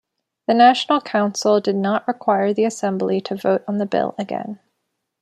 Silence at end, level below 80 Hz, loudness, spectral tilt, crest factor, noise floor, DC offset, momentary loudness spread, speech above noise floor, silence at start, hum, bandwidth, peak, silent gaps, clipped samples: 0.65 s; -70 dBFS; -19 LUFS; -5 dB/octave; 18 dB; -75 dBFS; under 0.1%; 13 LU; 57 dB; 0.5 s; none; 12.5 kHz; -2 dBFS; none; under 0.1%